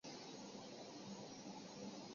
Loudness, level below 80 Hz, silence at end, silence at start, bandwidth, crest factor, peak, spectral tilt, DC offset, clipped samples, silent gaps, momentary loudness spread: -53 LUFS; -86 dBFS; 0 s; 0.05 s; 7.4 kHz; 14 dB; -40 dBFS; -4 dB/octave; under 0.1%; under 0.1%; none; 1 LU